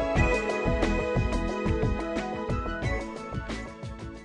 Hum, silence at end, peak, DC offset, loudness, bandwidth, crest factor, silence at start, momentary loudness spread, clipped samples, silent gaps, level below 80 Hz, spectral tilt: none; 0 s; -10 dBFS; under 0.1%; -29 LUFS; 10.5 kHz; 18 dB; 0 s; 11 LU; under 0.1%; none; -34 dBFS; -6.5 dB/octave